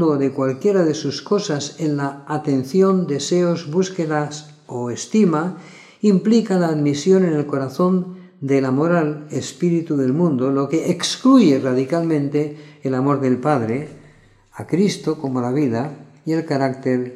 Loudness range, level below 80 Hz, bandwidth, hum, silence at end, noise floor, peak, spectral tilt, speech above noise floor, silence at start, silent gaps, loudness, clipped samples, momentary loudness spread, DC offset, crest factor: 4 LU; -66 dBFS; 12.5 kHz; none; 0 s; -50 dBFS; -2 dBFS; -6.5 dB/octave; 31 dB; 0 s; none; -19 LUFS; under 0.1%; 11 LU; under 0.1%; 16 dB